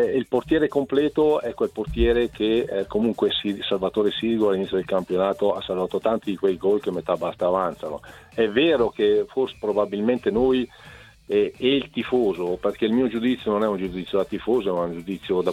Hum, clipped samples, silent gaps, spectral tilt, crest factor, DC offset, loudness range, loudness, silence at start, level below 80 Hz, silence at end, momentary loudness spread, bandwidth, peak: none; under 0.1%; none; -6.5 dB/octave; 16 dB; under 0.1%; 1 LU; -23 LUFS; 0 s; -44 dBFS; 0 s; 6 LU; 12.5 kHz; -6 dBFS